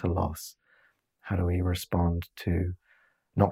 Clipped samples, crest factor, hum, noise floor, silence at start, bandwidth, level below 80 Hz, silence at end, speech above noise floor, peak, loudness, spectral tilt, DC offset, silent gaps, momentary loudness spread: under 0.1%; 22 dB; none; -67 dBFS; 0 s; 16 kHz; -48 dBFS; 0 s; 38 dB; -8 dBFS; -30 LUFS; -7 dB/octave; under 0.1%; none; 15 LU